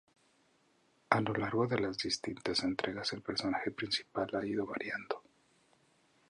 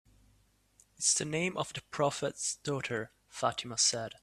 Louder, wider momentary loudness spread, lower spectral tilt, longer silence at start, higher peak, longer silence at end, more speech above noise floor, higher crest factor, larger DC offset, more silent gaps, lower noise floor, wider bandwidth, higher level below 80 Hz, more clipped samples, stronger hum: second, -35 LUFS vs -32 LUFS; second, 6 LU vs 10 LU; first, -4.5 dB/octave vs -2 dB/octave; about the same, 1.1 s vs 1 s; first, -8 dBFS vs -14 dBFS; first, 1.1 s vs 0.1 s; about the same, 36 dB vs 35 dB; first, 30 dB vs 20 dB; neither; neither; about the same, -72 dBFS vs -69 dBFS; second, 11 kHz vs 14.5 kHz; about the same, -68 dBFS vs -68 dBFS; neither; neither